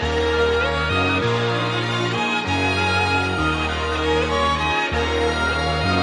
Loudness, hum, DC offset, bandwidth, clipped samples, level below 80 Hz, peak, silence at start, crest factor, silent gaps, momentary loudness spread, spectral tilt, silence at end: -20 LUFS; none; under 0.1%; 11 kHz; under 0.1%; -36 dBFS; -6 dBFS; 0 s; 14 dB; none; 3 LU; -5 dB/octave; 0 s